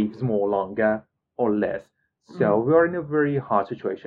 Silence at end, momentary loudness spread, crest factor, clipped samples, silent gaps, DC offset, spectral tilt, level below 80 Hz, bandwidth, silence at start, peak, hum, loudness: 0.1 s; 10 LU; 18 dB; under 0.1%; none; under 0.1%; -10 dB/octave; -62 dBFS; 5 kHz; 0 s; -6 dBFS; none; -23 LUFS